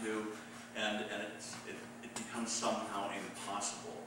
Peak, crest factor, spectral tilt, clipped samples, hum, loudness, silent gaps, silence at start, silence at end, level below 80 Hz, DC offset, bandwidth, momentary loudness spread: -24 dBFS; 18 dB; -2.5 dB/octave; under 0.1%; none; -40 LUFS; none; 0 s; 0 s; -80 dBFS; under 0.1%; 16 kHz; 10 LU